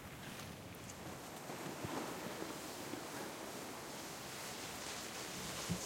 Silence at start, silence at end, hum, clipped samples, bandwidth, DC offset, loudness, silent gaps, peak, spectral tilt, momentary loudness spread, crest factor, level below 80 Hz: 0 s; 0 s; none; under 0.1%; 16.5 kHz; under 0.1%; -46 LUFS; none; -28 dBFS; -3 dB/octave; 5 LU; 20 dB; -70 dBFS